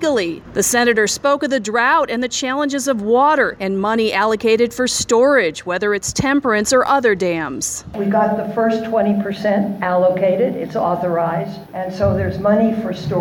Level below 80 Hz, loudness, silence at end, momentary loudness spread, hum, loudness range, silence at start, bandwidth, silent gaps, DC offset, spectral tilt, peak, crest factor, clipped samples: -46 dBFS; -17 LUFS; 0 s; 7 LU; none; 2 LU; 0 s; 17.5 kHz; none; under 0.1%; -4 dB/octave; -4 dBFS; 14 dB; under 0.1%